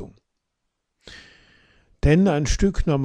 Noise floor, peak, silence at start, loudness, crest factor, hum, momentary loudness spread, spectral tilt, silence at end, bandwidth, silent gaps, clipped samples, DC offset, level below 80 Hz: -78 dBFS; -6 dBFS; 0 s; -20 LUFS; 16 dB; none; 23 LU; -6.5 dB/octave; 0 s; 9.8 kHz; none; under 0.1%; under 0.1%; -30 dBFS